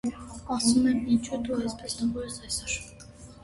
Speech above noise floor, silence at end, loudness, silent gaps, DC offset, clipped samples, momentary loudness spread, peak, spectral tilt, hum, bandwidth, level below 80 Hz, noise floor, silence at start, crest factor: 20 dB; 0 s; -28 LUFS; none; under 0.1%; under 0.1%; 19 LU; -10 dBFS; -3.5 dB/octave; none; 12 kHz; -50 dBFS; -48 dBFS; 0.05 s; 18 dB